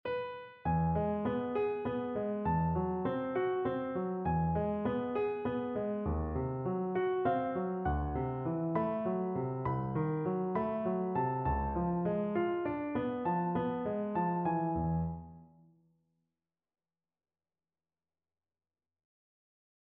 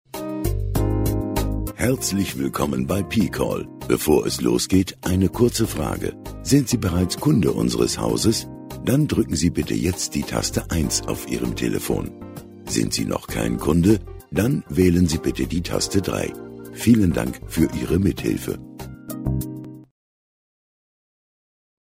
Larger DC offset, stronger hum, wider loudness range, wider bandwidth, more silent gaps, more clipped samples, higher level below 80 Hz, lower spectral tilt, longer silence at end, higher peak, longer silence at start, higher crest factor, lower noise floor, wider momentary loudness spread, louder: neither; neither; about the same, 3 LU vs 4 LU; second, 4.3 kHz vs 16 kHz; neither; neither; second, -50 dBFS vs -36 dBFS; first, -8 dB/octave vs -5.5 dB/octave; first, 4.45 s vs 1.95 s; second, -20 dBFS vs -4 dBFS; about the same, 0.05 s vs 0.15 s; about the same, 16 dB vs 18 dB; about the same, under -90 dBFS vs under -90 dBFS; second, 4 LU vs 11 LU; second, -34 LUFS vs -22 LUFS